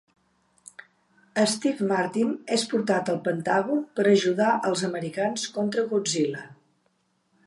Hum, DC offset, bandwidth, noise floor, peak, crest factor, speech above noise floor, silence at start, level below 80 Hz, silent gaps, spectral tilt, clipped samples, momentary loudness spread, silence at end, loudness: none; under 0.1%; 11.5 kHz; -70 dBFS; -8 dBFS; 18 dB; 46 dB; 1.35 s; -74 dBFS; none; -4.5 dB/octave; under 0.1%; 7 LU; 0.95 s; -25 LUFS